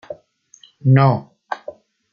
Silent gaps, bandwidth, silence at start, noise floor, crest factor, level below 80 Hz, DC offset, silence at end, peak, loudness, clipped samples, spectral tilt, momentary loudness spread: none; 6.8 kHz; 0.1 s; -51 dBFS; 18 dB; -58 dBFS; under 0.1%; 0.4 s; -2 dBFS; -16 LUFS; under 0.1%; -9 dB/octave; 24 LU